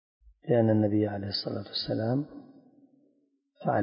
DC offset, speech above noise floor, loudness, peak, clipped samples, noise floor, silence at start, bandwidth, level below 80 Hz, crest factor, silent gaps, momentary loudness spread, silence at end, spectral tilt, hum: under 0.1%; 44 dB; -29 LUFS; -12 dBFS; under 0.1%; -71 dBFS; 0.45 s; 5.4 kHz; -62 dBFS; 18 dB; none; 15 LU; 0 s; -11 dB/octave; none